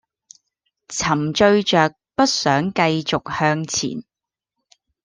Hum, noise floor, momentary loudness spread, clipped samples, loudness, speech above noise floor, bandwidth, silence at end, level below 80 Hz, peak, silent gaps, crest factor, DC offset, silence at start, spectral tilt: none; -82 dBFS; 8 LU; under 0.1%; -19 LUFS; 64 dB; 10.5 kHz; 1.05 s; -54 dBFS; -2 dBFS; none; 20 dB; under 0.1%; 0.9 s; -4 dB/octave